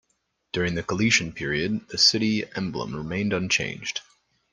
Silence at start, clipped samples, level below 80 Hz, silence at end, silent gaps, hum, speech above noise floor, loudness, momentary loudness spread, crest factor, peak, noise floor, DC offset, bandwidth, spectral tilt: 0.55 s; under 0.1%; -54 dBFS; 0.5 s; none; none; 49 dB; -24 LUFS; 13 LU; 22 dB; -4 dBFS; -74 dBFS; under 0.1%; 11 kHz; -3.5 dB/octave